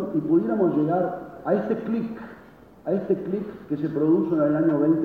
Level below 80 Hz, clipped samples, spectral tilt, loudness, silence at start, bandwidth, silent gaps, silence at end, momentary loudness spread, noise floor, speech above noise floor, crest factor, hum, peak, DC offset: -60 dBFS; under 0.1%; -10.5 dB/octave; -24 LUFS; 0 s; 4.5 kHz; none; 0 s; 11 LU; -48 dBFS; 25 dB; 14 dB; none; -8 dBFS; under 0.1%